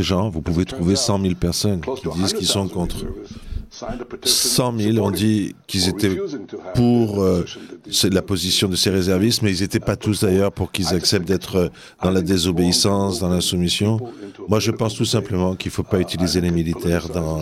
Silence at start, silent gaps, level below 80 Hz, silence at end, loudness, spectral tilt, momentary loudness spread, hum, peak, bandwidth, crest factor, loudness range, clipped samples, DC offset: 0 s; none; -42 dBFS; 0 s; -19 LUFS; -4.5 dB/octave; 9 LU; none; -2 dBFS; 16 kHz; 18 dB; 2 LU; under 0.1%; under 0.1%